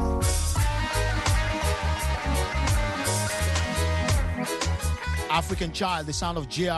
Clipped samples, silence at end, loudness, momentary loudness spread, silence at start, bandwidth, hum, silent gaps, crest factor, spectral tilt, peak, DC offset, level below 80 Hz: under 0.1%; 0 s; -26 LUFS; 4 LU; 0 s; 12.5 kHz; none; none; 16 dB; -4 dB/octave; -10 dBFS; under 0.1%; -30 dBFS